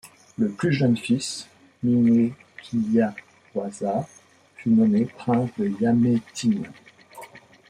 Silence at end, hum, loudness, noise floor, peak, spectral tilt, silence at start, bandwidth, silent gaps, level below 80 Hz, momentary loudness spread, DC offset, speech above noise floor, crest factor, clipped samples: 0.3 s; none; -23 LUFS; -46 dBFS; -8 dBFS; -6.5 dB/octave; 0.4 s; 11.5 kHz; none; -64 dBFS; 20 LU; under 0.1%; 24 dB; 16 dB; under 0.1%